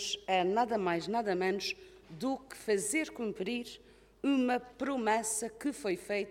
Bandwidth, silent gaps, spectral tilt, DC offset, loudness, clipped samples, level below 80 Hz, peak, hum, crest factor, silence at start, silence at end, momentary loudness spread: 16.5 kHz; none; -3.5 dB/octave; under 0.1%; -33 LUFS; under 0.1%; -68 dBFS; -16 dBFS; none; 18 dB; 0 s; 0 s; 9 LU